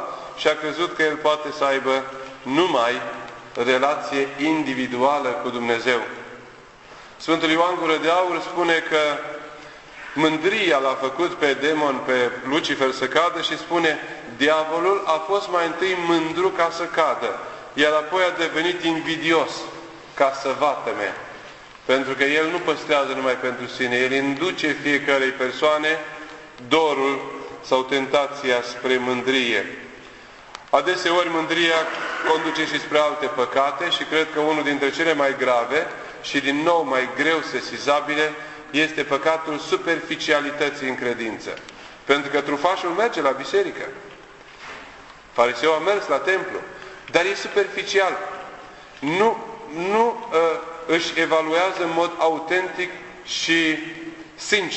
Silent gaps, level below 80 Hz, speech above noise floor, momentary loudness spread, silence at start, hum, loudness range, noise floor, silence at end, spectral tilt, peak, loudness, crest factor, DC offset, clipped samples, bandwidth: none; -60 dBFS; 23 dB; 14 LU; 0 s; none; 2 LU; -44 dBFS; 0 s; -3.5 dB/octave; -2 dBFS; -21 LUFS; 20 dB; under 0.1%; under 0.1%; 8.4 kHz